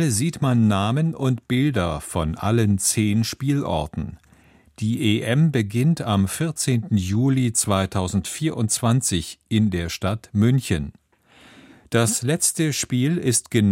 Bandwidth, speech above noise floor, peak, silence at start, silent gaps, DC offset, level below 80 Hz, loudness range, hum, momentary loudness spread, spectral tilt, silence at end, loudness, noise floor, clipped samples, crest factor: 16.5 kHz; 33 dB; -4 dBFS; 0 s; none; under 0.1%; -44 dBFS; 2 LU; none; 7 LU; -5 dB/octave; 0 s; -21 LUFS; -54 dBFS; under 0.1%; 18 dB